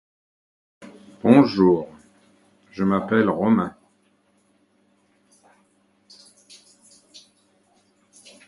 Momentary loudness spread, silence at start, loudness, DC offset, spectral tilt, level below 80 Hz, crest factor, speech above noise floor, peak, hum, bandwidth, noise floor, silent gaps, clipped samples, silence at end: 15 LU; 0.8 s; -19 LUFS; under 0.1%; -7.5 dB/octave; -60 dBFS; 24 dB; 46 dB; 0 dBFS; none; 11.5 kHz; -64 dBFS; none; under 0.1%; 4.8 s